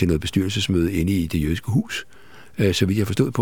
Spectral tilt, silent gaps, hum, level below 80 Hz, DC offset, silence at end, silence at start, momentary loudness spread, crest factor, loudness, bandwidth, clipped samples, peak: -6 dB/octave; none; none; -38 dBFS; 0.7%; 0 s; 0 s; 5 LU; 18 dB; -22 LUFS; 18 kHz; under 0.1%; -4 dBFS